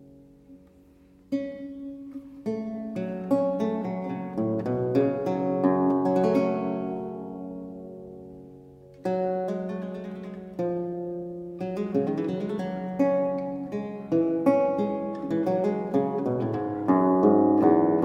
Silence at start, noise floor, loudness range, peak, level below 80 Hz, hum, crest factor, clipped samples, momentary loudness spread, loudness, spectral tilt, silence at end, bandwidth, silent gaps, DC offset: 0 s; -55 dBFS; 8 LU; -6 dBFS; -62 dBFS; none; 20 dB; under 0.1%; 16 LU; -27 LUFS; -9.5 dB/octave; 0 s; 7.4 kHz; none; under 0.1%